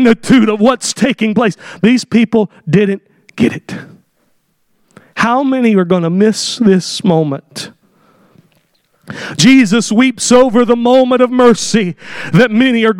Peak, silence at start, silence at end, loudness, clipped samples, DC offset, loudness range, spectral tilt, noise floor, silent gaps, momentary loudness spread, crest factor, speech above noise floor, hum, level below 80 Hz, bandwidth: 0 dBFS; 0 s; 0 s; -11 LUFS; 0.1%; under 0.1%; 6 LU; -5 dB/octave; -59 dBFS; none; 15 LU; 12 dB; 48 dB; none; -50 dBFS; 13 kHz